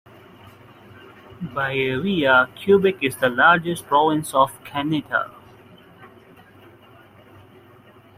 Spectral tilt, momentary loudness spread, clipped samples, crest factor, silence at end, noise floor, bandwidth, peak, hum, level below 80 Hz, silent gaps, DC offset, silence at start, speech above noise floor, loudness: -5 dB/octave; 10 LU; under 0.1%; 20 dB; 2.1 s; -49 dBFS; 16 kHz; -2 dBFS; none; -60 dBFS; none; under 0.1%; 1.3 s; 30 dB; -19 LUFS